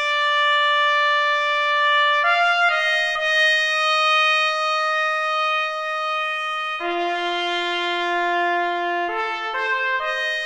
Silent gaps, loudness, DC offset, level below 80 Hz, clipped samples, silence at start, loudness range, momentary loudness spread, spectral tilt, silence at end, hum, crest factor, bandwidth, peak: none; -19 LUFS; under 0.1%; -62 dBFS; under 0.1%; 0 s; 5 LU; 7 LU; 0.5 dB/octave; 0 s; none; 14 dB; 12.5 kHz; -6 dBFS